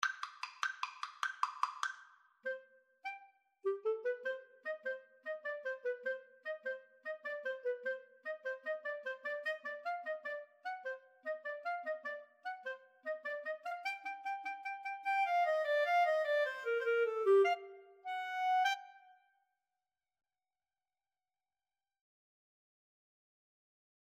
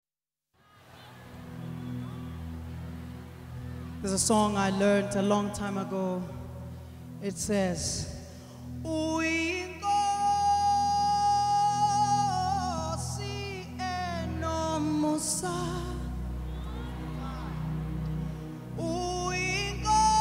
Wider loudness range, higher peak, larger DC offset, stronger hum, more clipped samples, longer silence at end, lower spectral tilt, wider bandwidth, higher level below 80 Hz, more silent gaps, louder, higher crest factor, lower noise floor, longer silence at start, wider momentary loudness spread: about the same, 9 LU vs 9 LU; about the same, -16 dBFS vs -14 dBFS; neither; neither; neither; first, 5 s vs 0 s; second, 0 dB/octave vs -4.5 dB/octave; second, 14 kHz vs 16 kHz; second, under -90 dBFS vs -44 dBFS; neither; second, -39 LUFS vs -30 LUFS; first, 24 dB vs 16 dB; about the same, under -90 dBFS vs under -90 dBFS; second, 0 s vs 0.85 s; second, 14 LU vs 17 LU